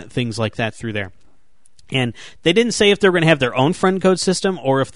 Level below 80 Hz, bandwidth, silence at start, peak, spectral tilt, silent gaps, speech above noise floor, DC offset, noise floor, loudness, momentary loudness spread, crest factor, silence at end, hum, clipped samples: -50 dBFS; 11 kHz; 0 s; -2 dBFS; -5 dB/octave; none; 42 dB; 0.8%; -59 dBFS; -17 LUFS; 11 LU; 16 dB; 0.05 s; none; under 0.1%